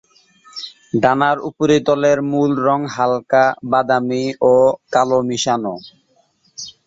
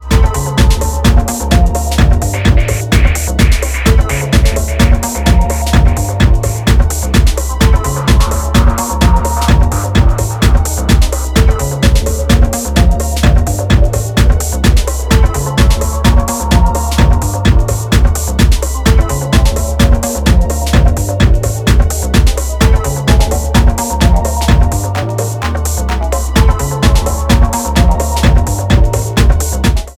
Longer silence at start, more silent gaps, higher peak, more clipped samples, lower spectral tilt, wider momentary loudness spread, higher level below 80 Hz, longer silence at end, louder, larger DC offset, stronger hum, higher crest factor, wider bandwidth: first, 0.55 s vs 0 s; neither; about the same, -2 dBFS vs 0 dBFS; neither; about the same, -5 dB/octave vs -5 dB/octave; first, 17 LU vs 2 LU; second, -58 dBFS vs -12 dBFS; about the same, 0.15 s vs 0.05 s; second, -16 LUFS vs -12 LUFS; second, under 0.1% vs 0.2%; neither; first, 16 dB vs 10 dB; second, 7.8 kHz vs 16 kHz